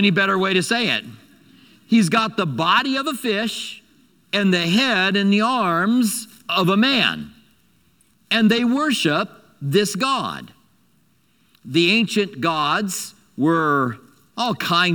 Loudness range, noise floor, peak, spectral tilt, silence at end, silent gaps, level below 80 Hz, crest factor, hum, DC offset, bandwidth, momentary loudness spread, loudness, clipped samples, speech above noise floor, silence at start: 3 LU; -61 dBFS; -2 dBFS; -4.5 dB/octave; 0 s; none; -64 dBFS; 18 dB; none; under 0.1%; 19 kHz; 12 LU; -19 LUFS; under 0.1%; 42 dB; 0 s